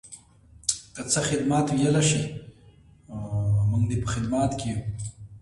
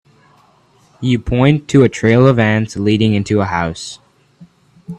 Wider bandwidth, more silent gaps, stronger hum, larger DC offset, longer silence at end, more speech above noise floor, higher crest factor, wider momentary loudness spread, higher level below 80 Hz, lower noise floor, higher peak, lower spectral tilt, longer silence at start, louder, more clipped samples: first, 11.5 kHz vs 9.8 kHz; neither; neither; neither; about the same, 0 s vs 0 s; second, 29 dB vs 39 dB; first, 22 dB vs 16 dB; first, 16 LU vs 11 LU; second, -46 dBFS vs -40 dBFS; about the same, -54 dBFS vs -52 dBFS; second, -4 dBFS vs 0 dBFS; second, -5 dB/octave vs -7 dB/octave; second, 0.05 s vs 1 s; second, -25 LUFS vs -14 LUFS; neither